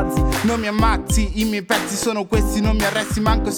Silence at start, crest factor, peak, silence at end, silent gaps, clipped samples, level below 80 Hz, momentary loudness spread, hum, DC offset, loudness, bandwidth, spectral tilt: 0 s; 16 dB; -4 dBFS; 0 s; none; under 0.1%; -24 dBFS; 3 LU; none; under 0.1%; -19 LUFS; over 20 kHz; -4.5 dB/octave